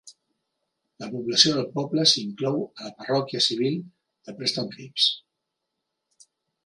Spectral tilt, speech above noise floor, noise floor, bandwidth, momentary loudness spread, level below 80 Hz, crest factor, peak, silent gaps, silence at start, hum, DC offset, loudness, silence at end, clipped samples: -3.5 dB/octave; 57 dB; -82 dBFS; 11.5 kHz; 17 LU; -72 dBFS; 26 dB; -2 dBFS; none; 0.05 s; none; under 0.1%; -23 LUFS; 1.45 s; under 0.1%